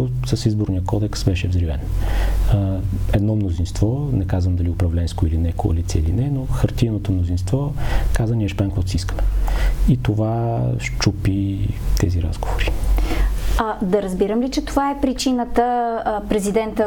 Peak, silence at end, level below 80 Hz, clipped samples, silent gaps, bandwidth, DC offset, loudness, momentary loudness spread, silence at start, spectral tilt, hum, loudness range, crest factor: -4 dBFS; 0 s; -24 dBFS; under 0.1%; none; 18 kHz; under 0.1%; -21 LUFS; 4 LU; 0 s; -6.5 dB/octave; none; 1 LU; 14 dB